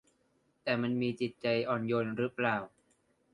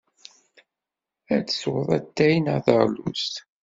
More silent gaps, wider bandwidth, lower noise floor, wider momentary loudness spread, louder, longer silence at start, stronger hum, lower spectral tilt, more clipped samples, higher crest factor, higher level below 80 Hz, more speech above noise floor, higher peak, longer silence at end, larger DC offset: neither; first, 10.5 kHz vs 7.8 kHz; second, -73 dBFS vs -87 dBFS; about the same, 5 LU vs 7 LU; second, -33 LUFS vs -23 LUFS; second, 0.65 s vs 1.3 s; neither; first, -7.5 dB/octave vs -6 dB/octave; neither; about the same, 20 dB vs 22 dB; second, -72 dBFS vs -60 dBFS; second, 41 dB vs 65 dB; second, -14 dBFS vs -2 dBFS; first, 0.65 s vs 0.2 s; neither